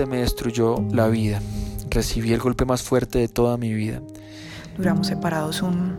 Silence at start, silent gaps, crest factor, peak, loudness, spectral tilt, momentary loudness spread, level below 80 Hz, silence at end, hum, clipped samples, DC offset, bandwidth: 0 s; none; 16 dB; -6 dBFS; -23 LUFS; -6 dB/octave; 12 LU; -34 dBFS; 0 s; none; under 0.1%; under 0.1%; 16.5 kHz